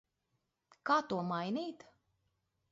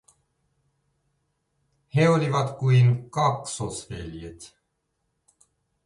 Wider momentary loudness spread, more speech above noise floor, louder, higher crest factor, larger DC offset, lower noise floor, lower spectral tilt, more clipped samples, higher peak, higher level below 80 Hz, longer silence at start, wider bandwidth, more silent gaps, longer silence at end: second, 13 LU vs 18 LU; second, 48 dB vs 53 dB; second, -36 LUFS vs -23 LUFS; about the same, 22 dB vs 18 dB; neither; first, -83 dBFS vs -76 dBFS; second, -4 dB/octave vs -6.5 dB/octave; neither; second, -18 dBFS vs -10 dBFS; second, -80 dBFS vs -54 dBFS; second, 0.85 s vs 1.95 s; second, 7.6 kHz vs 11.5 kHz; neither; second, 0.95 s vs 1.4 s